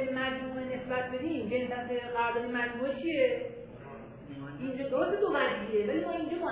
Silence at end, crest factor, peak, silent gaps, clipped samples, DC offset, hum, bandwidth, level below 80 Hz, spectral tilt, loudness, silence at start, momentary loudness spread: 0 s; 18 dB; -14 dBFS; none; under 0.1%; under 0.1%; none; 4 kHz; -60 dBFS; -3.5 dB/octave; -32 LUFS; 0 s; 15 LU